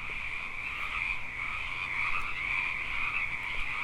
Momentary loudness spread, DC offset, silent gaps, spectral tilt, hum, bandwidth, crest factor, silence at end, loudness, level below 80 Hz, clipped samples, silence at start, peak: 5 LU; under 0.1%; none; -2.5 dB/octave; none; 13 kHz; 14 dB; 0 s; -32 LUFS; -46 dBFS; under 0.1%; 0 s; -18 dBFS